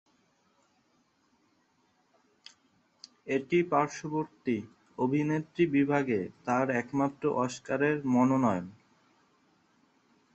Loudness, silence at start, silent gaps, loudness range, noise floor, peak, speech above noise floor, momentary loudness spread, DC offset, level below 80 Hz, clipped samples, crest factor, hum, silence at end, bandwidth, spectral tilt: -30 LUFS; 3.25 s; none; 6 LU; -71 dBFS; -12 dBFS; 42 dB; 9 LU; under 0.1%; -70 dBFS; under 0.1%; 20 dB; none; 1.65 s; 8.2 kHz; -7 dB/octave